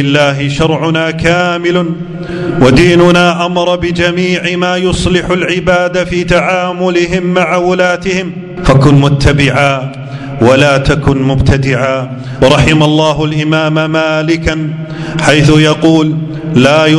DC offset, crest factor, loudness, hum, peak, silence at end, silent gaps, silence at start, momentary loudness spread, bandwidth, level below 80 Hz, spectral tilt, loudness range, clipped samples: under 0.1%; 10 dB; -10 LUFS; none; 0 dBFS; 0 s; none; 0 s; 10 LU; 12 kHz; -28 dBFS; -6 dB/octave; 2 LU; 2%